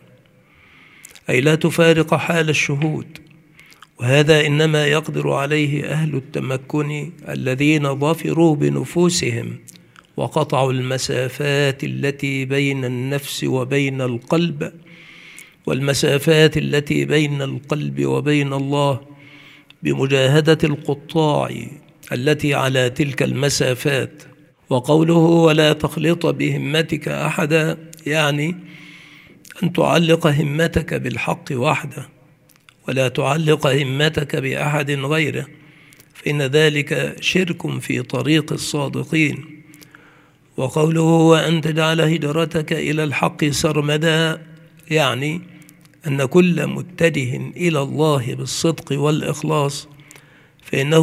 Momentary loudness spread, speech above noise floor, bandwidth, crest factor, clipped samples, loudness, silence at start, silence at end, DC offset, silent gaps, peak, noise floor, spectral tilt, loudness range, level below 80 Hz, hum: 11 LU; 34 dB; 15.5 kHz; 18 dB; under 0.1%; -18 LUFS; 1.3 s; 0 s; under 0.1%; none; 0 dBFS; -52 dBFS; -5.5 dB/octave; 4 LU; -52 dBFS; none